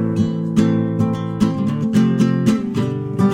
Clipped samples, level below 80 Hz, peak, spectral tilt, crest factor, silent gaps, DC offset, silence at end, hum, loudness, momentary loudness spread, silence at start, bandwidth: under 0.1%; -48 dBFS; -4 dBFS; -8 dB/octave; 14 dB; none; under 0.1%; 0 s; none; -18 LUFS; 5 LU; 0 s; 11.5 kHz